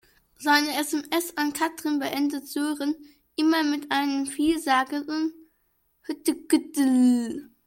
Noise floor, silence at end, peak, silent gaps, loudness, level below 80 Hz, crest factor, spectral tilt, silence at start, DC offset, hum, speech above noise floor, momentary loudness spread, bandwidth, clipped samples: -70 dBFS; 0.2 s; -6 dBFS; none; -25 LUFS; -64 dBFS; 20 dB; -2 dB/octave; 0.4 s; under 0.1%; none; 45 dB; 9 LU; 17 kHz; under 0.1%